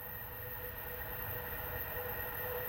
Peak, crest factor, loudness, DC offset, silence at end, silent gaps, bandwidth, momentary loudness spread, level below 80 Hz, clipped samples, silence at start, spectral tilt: -26 dBFS; 16 dB; -40 LUFS; under 0.1%; 0 s; none; 17 kHz; 4 LU; -54 dBFS; under 0.1%; 0 s; -5.5 dB/octave